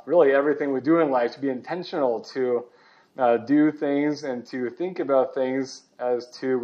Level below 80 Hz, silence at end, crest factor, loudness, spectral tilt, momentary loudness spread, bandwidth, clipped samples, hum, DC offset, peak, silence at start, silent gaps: -84 dBFS; 0 s; 18 dB; -24 LUFS; -6.5 dB/octave; 11 LU; 7.6 kHz; under 0.1%; none; under 0.1%; -6 dBFS; 0.05 s; none